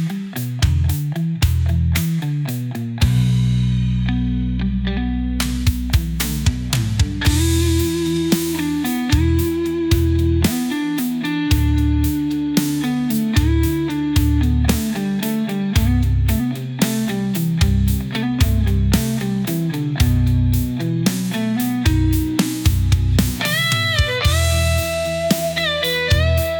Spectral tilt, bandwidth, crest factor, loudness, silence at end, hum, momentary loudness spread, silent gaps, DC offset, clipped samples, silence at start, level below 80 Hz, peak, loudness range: -5.5 dB/octave; 19.5 kHz; 14 dB; -19 LUFS; 0 s; none; 5 LU; none; under 0.1%; under 0.1%; 0 s; -26 dBFS; -4 dBFS; 2 LU